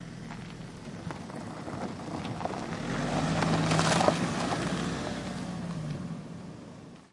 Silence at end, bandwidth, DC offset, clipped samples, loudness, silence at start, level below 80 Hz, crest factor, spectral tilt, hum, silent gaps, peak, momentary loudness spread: 0.05 s; 11.5 kHz; under 0.1%; under 0.1%; -32 LUFS; 0 s; -52 dBFS; 24 dB; -5 dB/octave; none; none; -8 dBFS; 17 LU